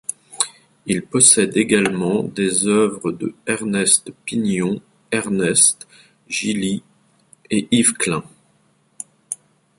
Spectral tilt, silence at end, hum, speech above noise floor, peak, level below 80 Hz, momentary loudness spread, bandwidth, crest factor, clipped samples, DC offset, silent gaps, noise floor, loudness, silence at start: -3 dB/octave; 0.45 s; none; 41 dB; 0 dBFS; -58 dBFS; 17 LU; 12 kHz; 20 dB; under 0.1%; under 0.1%; none; -60 dBFS; -18 LUFS; 0.1 s